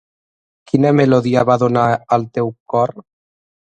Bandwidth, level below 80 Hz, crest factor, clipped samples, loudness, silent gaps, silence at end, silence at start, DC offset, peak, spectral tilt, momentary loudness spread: 9 kHz; -54 dBFS; 16 dB; under 0.1%; -16 LUFS; 2.60-2.66 s; 0.6 s; 0.75 s; under 0.1%; 0 dBFS; -8 dB/octave; 8 LU